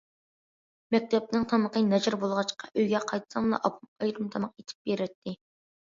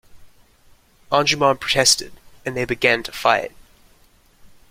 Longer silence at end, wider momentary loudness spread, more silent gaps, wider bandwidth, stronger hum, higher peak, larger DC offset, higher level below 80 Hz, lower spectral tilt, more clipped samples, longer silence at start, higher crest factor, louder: first, 0.6 s vs 0.25 s; second, 10 LU vs 15 LU; first, 3.88-3.96 s, 4.75-4.85 s, 5.15-5.22 s vs none; second, 7.6 kHz vs 16.5 kHz; neither; second, -10 dBFS vs -2 dBFS; neither; second, -68 dBFS vs -50 dBFS; first, -5.5 dB/octave vs -2 dB/octave; neither; first, 0.9 s vs 0.15 s; about the same, 18 dB vs 20 dB; second, -29 LUFS vs -18 LUFS